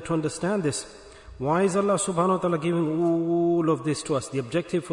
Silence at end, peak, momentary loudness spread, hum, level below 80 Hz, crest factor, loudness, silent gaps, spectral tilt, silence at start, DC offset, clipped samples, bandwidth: 0 s; -10 dBFS; 6 LU; none; -56 dBFS; 14 dB; -25 LUFS; none; -6 dB/octave; 0 s; under 0.1%; under 0.1%; 11 kHz